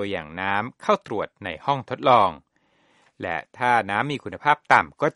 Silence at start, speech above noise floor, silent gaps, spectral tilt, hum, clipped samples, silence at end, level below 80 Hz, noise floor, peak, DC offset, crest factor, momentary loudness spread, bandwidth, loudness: 0 s; 41 dB; none; -5.5 dB/octave; none; under 0.1%; 0.05 s; -60 dBFS; -63 dBFS; 0 dBFS; under 0.1%; 24 dB; 12 LU; 11.5 kHz; -23 LUFS